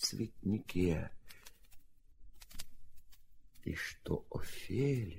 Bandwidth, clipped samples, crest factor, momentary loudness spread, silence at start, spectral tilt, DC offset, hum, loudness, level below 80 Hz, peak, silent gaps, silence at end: 16 kHz; under 0.1%; 18 dB; 22 LU; 0 s; -5 dB/octave; under 0.1%; none; -39 LUFS; -54 dBFS; -20 dBFS; none; 0 s